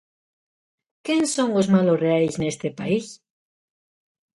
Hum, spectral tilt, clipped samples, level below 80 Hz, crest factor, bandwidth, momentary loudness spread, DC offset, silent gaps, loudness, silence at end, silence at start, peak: none; -5.5 dB/octave; under 0.1%; -60 dBFS; 18 dB; 11.5 kHz; 10 LU; under 0.1%; none; -22 LUFS; 1.2 s; 1.05 s; -6 dBFS